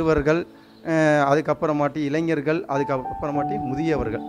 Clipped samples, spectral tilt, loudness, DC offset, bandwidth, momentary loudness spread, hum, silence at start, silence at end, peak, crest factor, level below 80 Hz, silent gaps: under 0.1%; -7 dB/octave; -22 LUFS; under 0.1%; 10.5 kHz; 7 LU; none; 0 s; 0 s; -6 dBFS; 16 dB; -44 dBFS; none